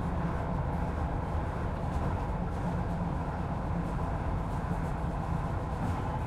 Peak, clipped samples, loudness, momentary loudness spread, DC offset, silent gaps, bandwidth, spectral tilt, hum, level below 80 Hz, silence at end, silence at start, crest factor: -20 dBFS; under 0.1%; -34 LUFS; 1 LU; under 0.1%; none; 12 kHz; -8.5 dB/octave; none; -38 dBFS; 0 s; 0 s; 12 dB